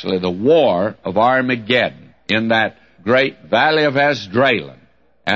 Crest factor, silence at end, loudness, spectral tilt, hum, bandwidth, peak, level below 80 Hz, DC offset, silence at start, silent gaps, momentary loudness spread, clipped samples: 14 dB; 0 s; -16 LUFS; -6 dB/octave; none; 7.8 kHz; -2 dBFS; -58 dBFS; 0.2%; 0 s; none; 9 LU; under 0.1%